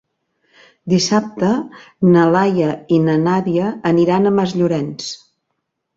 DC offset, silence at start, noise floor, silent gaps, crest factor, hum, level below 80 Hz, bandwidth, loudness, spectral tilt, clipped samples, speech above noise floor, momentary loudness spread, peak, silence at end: under 0.1%; 0.85 s; -74 dBFS; none; 14 dB; none; -56 dBFS; 7.8 kHz; -16 LUFS; -6.5 dB/octave; under 0.1%; 58 dB; 13 LU; -2 dBFS; 0.8 s